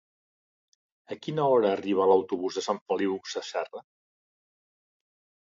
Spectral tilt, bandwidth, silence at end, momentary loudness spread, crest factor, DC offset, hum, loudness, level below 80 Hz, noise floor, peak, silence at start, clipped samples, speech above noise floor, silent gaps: -5.5 dB/octave; 7.6 kHz; 1.6 s; 16 LU; 20 dB; under 0.1%; none; -27 LUFS; -72 dBFS; under -90 dBFS; -10 dBFS; 1.1 s; under 0.1%; over 63 dB; 2.81-2.86 s